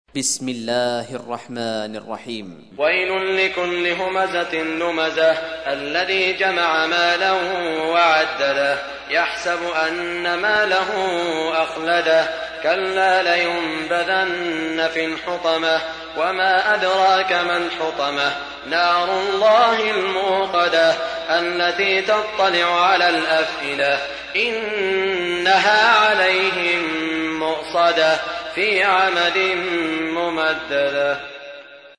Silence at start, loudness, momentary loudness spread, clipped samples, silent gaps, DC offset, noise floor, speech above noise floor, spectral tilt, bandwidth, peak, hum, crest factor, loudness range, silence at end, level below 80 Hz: 0.15 s; -18 LUFS; 8 LU; under 0.1%; none; under 0.1%; -39 dBFS; 20 dB; -2.5 dB/octave; 11 kHz; -4 dBFS; none; 16 dB; 3 LU; 0.1 s; -56 dBFS